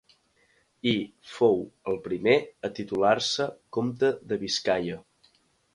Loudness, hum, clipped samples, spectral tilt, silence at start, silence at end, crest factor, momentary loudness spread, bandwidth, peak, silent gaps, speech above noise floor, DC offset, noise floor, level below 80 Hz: -27 LUFS; none; under 0.1%; -4.5 dB/octave; 0.85 s; 0.75 s; 20 dB; 11 LU; 11.5 kHz; -6 dBFS; none; 40 dB; under 0.1%; -66 dBFS; -64 dBFS